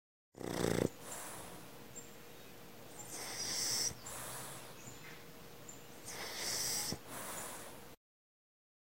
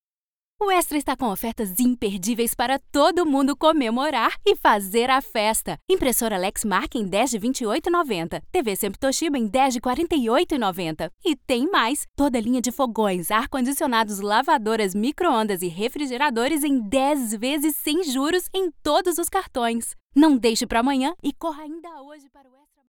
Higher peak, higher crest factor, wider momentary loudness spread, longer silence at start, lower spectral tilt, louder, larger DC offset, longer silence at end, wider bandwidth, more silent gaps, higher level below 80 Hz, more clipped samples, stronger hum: second, -18 dBFS vs -6 dBFS; first, 26 dB vs 18 dB; first, 19 LU vs 7 LU; second, 0.3 s vs 0.6 s; about the same, -2.5 dB/octave vs -3.5 dB/octave; second, -40 LUFS vs -22 LUFS; first, 0.2% vs under 0.1%; first, 0.95 s vs 0.8 s; second, 16 kHz vs over 20 kHz; second, none vs 5.82-5.88 s, 11.14-11.18 s, 12.08-12.14 s, 20.01-20.10 s; second, -66 dBFS vs -48 dBFS; neither; neither